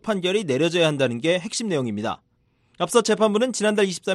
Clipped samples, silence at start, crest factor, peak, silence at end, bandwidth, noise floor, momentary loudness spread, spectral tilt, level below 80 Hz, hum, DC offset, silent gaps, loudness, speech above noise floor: under 0.1%; 0.05 s; 18 dB; -4 dBFS; 0 s; 12.5 kHz; -65 dBFS; 8 LU; -4 dB/octave; -66 dBFS; none; under 0.1%; none; -22 LUFS; 43 dB